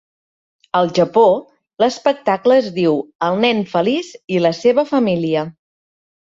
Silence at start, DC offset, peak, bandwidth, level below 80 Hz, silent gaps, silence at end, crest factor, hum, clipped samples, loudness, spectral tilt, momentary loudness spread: 0.75 s; under 0.1%; -2 dBFS; 7.8 kHz; -60 dBFS; 3.15-3.19 s, 4.24-4.28 s; 0.8 s; 16 dB; none; under 0.1%; -16 LUFS; -6 dB/octave; 8 LU